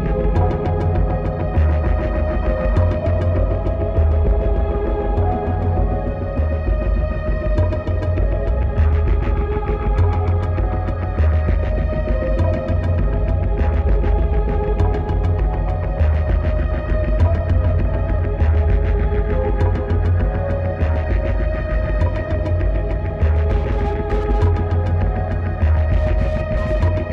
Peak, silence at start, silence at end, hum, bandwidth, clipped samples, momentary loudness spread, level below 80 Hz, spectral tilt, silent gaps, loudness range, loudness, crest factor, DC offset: -6 dBFS; 0 s; 0 s; none; 4.6 kHz; under 0.1%; 4 LU; -20 dBFS; -10 dB/octave; none; 2 LU; -20 LUFS; 12 dB; under 0.1%